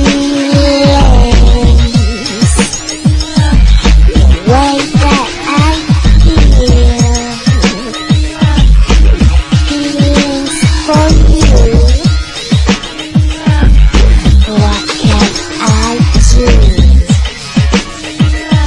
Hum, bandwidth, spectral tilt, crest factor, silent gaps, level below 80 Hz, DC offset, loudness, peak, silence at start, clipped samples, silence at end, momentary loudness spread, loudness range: none; 11 kHz; -5.5 dB/octave; 6 dB; none; -8 dBFS; under 0.1%; -9 LUFS; 0 dBFS; 0 s; 1%; 0 s; 5 LU; 1 LU